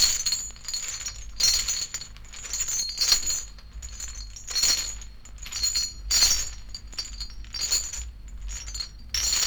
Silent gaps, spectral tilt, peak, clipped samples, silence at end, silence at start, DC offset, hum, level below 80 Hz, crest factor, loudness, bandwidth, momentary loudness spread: none; 1 dB/octave; -6 dBFS; under 0.1%; 0 s; 0 s; under 0.1%; none; -40 dBFS; 22 dB; -25 LUFS; over 20 kHz; 19 LU